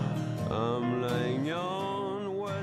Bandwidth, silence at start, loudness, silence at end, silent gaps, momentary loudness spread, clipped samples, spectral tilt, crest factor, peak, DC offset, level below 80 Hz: 14 kHz; 0 s; -32 LUFS; 0 s; none; 4 LU; under 0.1%; -7 dB/octave; 14 dB; -16 dBFS; under 0.1%; -60 dBFS